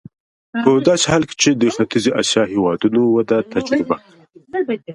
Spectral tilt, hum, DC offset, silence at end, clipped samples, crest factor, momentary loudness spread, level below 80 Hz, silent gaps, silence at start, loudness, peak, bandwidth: -4 dB/octave; none; under 0.1%; 0 s; under 0.1%; 16 dB; 9 LU; -52 dBFS; none; 0.55 s; -17 LUFS; 0 dBFS; 11.5 kHz